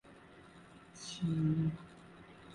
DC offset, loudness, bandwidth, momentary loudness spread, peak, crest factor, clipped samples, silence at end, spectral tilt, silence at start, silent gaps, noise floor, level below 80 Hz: under 0.1%; -36 LUFS; 11 kHz; 24 LU; -22 dBFS; 16 dB; under 0.1%; 0 s; -6.5 dB/octave; 0.05 s; none; -58 dBFS; -64 dBFS